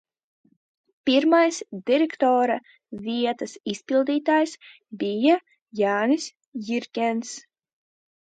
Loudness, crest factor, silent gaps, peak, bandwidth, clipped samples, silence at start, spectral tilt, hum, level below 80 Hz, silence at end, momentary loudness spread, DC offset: -23 LUFS; 18 dB; 5.62-5.66 s, 6.47-6.52 s; -8 dBFS; 9.4 kHz; under 0.1%; 1.05 s; -4 dB/octave; none; -76 dBFS; 0.9 s; 15 LU; under 0.1%